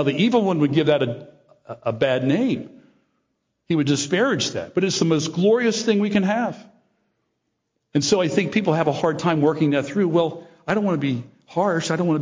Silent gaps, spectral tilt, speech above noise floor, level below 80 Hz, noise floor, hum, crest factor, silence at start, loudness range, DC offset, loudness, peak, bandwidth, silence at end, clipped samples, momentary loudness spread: none; -5.5 dB/octave; 55 dB; -62 dBFS; -75 dBFS; none; 16 dB; 0 s; 3 LU; under 0.1%; -21 LUFS; -6 dBFS; 7.6 kHz; 0 s; under 0.1%; 10 LU